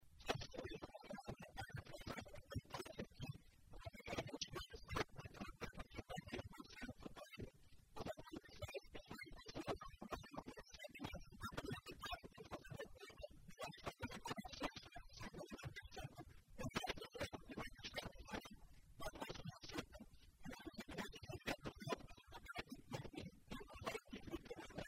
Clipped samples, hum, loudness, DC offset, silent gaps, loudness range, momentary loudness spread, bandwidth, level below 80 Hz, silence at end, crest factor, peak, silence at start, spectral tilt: under 0.1%; none; -52 LUFS; under 0.1%; none; 3 LU; 9 LU; 16 kHz; -64 dBFS; 0 s; 26 dB; -26 dBFS; 0 s; -4.5 dB/octave